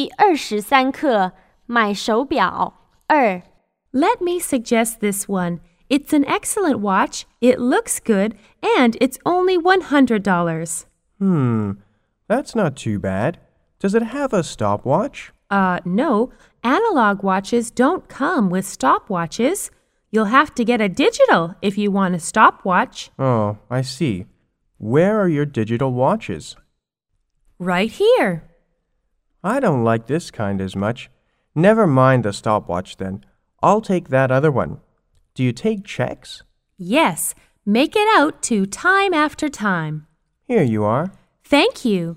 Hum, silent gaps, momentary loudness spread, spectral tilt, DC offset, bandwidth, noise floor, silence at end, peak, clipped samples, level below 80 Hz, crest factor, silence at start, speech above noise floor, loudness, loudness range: none; none; 11 LU; -5.5 dB/octave; under 0.1%; 16 kHz; -72 dBFS; 0 s; 0 dBFS; under 0.1%; -52 dBFS; 18 dB; 0 s; 54 dB; -18 LUFS; 4 LU